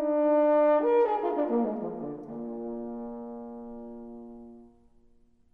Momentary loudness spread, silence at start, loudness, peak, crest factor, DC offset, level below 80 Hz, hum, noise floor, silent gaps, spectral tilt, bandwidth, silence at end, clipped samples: 21 LU; 0 s; -27 LUFS; -14 dBFS; 14 dB; under 0.1%; -62 dBFS; none; -62 dBFS; none; -9 dB/octave; 4.3 kHz; 0.85 s; under 0.1%